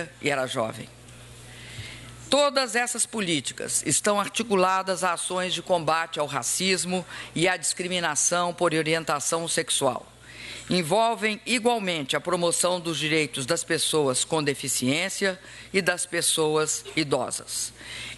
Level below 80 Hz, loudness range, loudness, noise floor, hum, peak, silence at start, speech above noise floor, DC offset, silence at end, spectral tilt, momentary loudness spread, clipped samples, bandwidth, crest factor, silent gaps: -60 dBFS; 1 LU; -25 LUFS; -45 dBFS; none; -6 dBFS; 0 s; 20 dB; under 0.1%; 0 s; -2.5 dB/octave; 12 LU; under 0.1%; 12.5 kHz; 20 dB; none